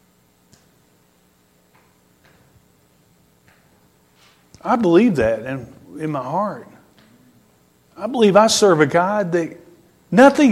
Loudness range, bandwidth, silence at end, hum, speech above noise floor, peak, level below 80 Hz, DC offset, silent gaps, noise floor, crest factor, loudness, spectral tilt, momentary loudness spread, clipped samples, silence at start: 6 LU; 15.5 kHz; 0 s; none; 42 dB; 0 dBFS; -54 dBFS; under 0.1%; none; -58 dBFS; 20 dB; -16 LUFS; -5 dB/octave; 18 LU; under 0.1%; 4.65 s